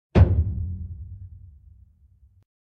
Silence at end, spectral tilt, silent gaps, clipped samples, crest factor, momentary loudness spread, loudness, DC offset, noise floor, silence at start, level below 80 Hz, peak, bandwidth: 1.4 s; -10 dB/octave; none; under 0.1%; 22 dB; 24 LU; -23 LUFS; under 0.1%; -56 dBFS; 0.15 s; -30 dBFS; -4 dBFS; 5.4 kHz